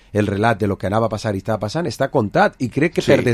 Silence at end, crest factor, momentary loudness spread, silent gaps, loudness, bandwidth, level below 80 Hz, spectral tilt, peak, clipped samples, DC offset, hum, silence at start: 0 s; 18 dB; 6 LU; none; -19 LUFS; 14.5 kHz; -42 dBFS; -6.5 dB/octave; 0 dBFS; under 0.1%; under 0.1%; none; 0.15 s